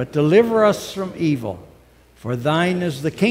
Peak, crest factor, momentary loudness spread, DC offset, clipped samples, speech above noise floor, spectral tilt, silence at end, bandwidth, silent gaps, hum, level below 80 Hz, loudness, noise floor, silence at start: -2 dBFS; 18 dB; 14 LU; under 0.1%; under 0.1%; 32 dB; -6.5 dB/octave; 0 s; 16 kHz; none; none; -54 dBFS; -19 LUFS; -50 dBFS; 0 s